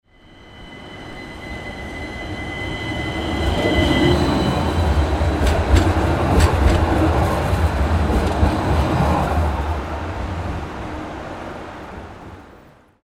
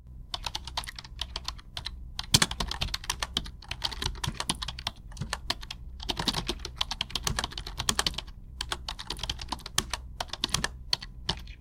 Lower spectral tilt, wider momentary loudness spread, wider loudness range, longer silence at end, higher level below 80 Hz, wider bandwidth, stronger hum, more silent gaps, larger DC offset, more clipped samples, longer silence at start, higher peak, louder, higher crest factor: first, -6.5 dB/octave vs -2 dB/octave; first, 17 LU vs 11 LU; first, 10 LU vs 3 LU; first, 0.55 s vs 0 s; first, -24 dBFS vs -42 dBFS; about the same, 15.5 kHz vs 16.5 kHz; neither; neither; neither; neither; first, 0.4 s vs 0 s; about the same, -2 dBFS vs -2 dBFS; first, -20 LUFS vs -32 LUFS; second, 18 dB vs 32 dB